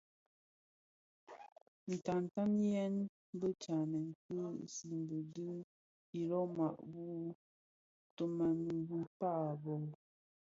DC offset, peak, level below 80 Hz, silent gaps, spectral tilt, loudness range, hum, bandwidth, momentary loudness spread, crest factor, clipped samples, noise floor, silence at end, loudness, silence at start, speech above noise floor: under 0.1%; -24 dBFS; -80 dBFS; 1.52-1.56 s, 1.62-1.87 s, 3.09-3.33 s, 4.15-4.29 s, 5.64-6.13 s, 7.35-8.17 s, 9.07-9.20 s; -8.5 dB/octave; 4 LU; none; 7.6 kHz; 13 LU; 16 dB; under 0.1%; under -90 dBFS; 0.5 s; -41 LUFS; 1.3 s; over 50 dB